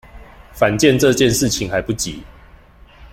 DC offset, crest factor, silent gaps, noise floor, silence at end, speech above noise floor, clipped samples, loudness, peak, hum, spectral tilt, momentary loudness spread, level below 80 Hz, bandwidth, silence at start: under 0.1%; 18 dB; none; -45 dBFS; 0.05 s; 29 dB; under 0.1%; -16 LUFS; 0 dBFS; none; -4 dB/octave; 10 LU; -40 dBFS; 16.5 kHz; 0.15 s